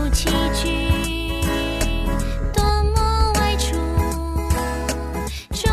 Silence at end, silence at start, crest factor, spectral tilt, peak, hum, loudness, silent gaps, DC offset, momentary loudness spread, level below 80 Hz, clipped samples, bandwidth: 0 s; 0 s; 14 dB; -4.5 dB/octave; -6 dBFS; none; -21 LUFS; none; under 0.1%; 6 LU; -24 dBFS; under 0.1%; 14 kHz